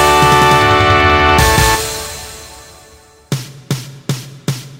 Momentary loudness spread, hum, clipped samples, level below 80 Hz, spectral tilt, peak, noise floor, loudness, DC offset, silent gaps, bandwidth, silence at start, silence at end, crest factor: 15 LU; none; under 0.1%; -26 dBFS; -4 dB/octave; 0 dBFS; -43 dBFS; -12 LUFS; under 0.1%; none; 16.5 kHz; 0 s; 0.05 s; 14 dB